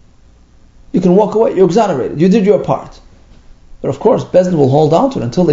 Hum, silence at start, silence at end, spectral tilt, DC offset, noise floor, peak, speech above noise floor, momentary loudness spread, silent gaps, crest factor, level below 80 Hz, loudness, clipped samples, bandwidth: none; 0.95 s; 0 s; -8 dB/octave; under 0.1%; -44 dBFS; 0 dBFS; 33 dB; 9 LU; none; 12 dB; -42 dBFS; -12 LUFS; 0.1%; 7.8 kHz